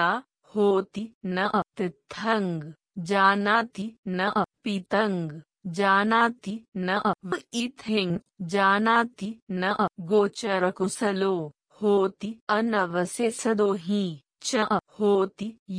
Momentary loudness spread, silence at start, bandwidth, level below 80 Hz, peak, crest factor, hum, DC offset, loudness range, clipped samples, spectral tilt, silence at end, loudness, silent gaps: 12 LU; 0 s; 10.5 kHz; -68 dBFS; -6 dBFS; 20 dB; none; under 0.1%; 1 LU; under 0.1%; -5 dB/octave; 0 s; -26 LUFS; 1.14-1.21 s, 3.98-4.03 s, 6.68-6.72 s, 9.42-9.47 s, 12.41-12.47 s, 15.59-15.66 s